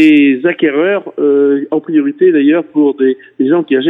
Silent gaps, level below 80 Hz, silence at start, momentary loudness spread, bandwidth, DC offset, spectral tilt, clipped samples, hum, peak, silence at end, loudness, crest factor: none; -70 dBFS; 0 s; 6 LU; 4.8 kHz; under 0.1%; -7.5 dB/octave; under 0.1%; none; 0 dBFS; 0 s; -11 LUFS; 10 dB